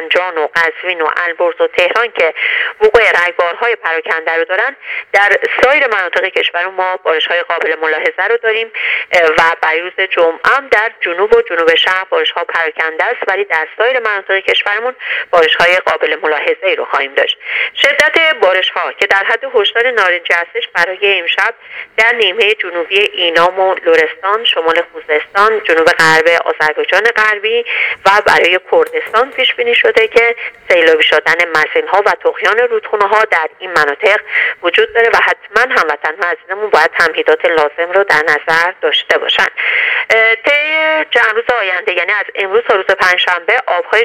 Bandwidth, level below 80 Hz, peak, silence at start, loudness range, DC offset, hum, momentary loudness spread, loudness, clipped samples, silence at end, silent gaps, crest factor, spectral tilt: 15 kHz; -52 dBFS; 0 dBFS; 0 s; 2 LU; under 0.1%; none; 6 LU; -11 LUFS; 0.3%; 0 s; none; 12 dB; -2 dB/octave